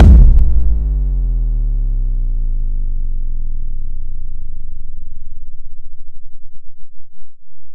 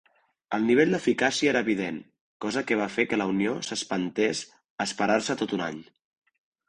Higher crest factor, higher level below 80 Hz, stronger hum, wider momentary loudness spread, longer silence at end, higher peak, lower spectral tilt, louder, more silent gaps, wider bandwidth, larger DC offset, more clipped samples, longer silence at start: second, 12 dB vs 20 dB; first, -14 dBFS vs -66 dBFS; neither; first, 22 LU vs 12 LU; second, 0 s vs 0.85 s; first, 0 dBFS vs -8 dBFS; first, -10.5 dB/octave vs -4 dB/octave; first, -19 LUFS vs -26 LUFS; second, none vs 2.21-2.40 s, 4.70-4.78 s; second, 1.6 kHz vs 10.5 kHz; neither; neither; second, 0 s vs 0.5 s